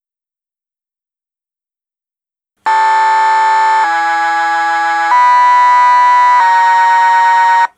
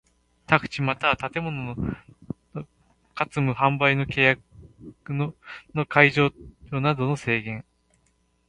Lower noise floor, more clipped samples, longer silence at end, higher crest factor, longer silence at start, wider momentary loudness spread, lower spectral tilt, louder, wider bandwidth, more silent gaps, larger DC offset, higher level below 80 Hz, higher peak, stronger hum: first, -87 dBFS vs -67 dBFS; neither; second, 0.1 s vs 0.85 s; second, 10 dB vs 26 dB; first, 2.65 s vs 0.5 s; second, 5 LU vs 20 LU; second, 1 dB/octave vs -6.5 dB/octave; first, -9 LUFS vs -23 LUFS; about the same, 11 kHz vs 10.5 kHz; neither; neither; second, -76 dBFS vs -52 dBFS; about the same, 0 dBFS vs 0 dBFS; neither